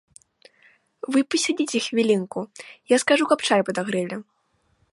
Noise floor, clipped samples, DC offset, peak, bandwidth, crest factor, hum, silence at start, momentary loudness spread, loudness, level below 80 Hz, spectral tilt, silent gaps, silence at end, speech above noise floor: -68 dBFS; under 0.1%; under 0.1%; -4 dBFS; 11.5 kHz; 20 dB; none; 1.1 s; 16 LU; -22 LUFS; -72 dBFS; -3.5 dB/octave; none; 0.7 s; 45 dB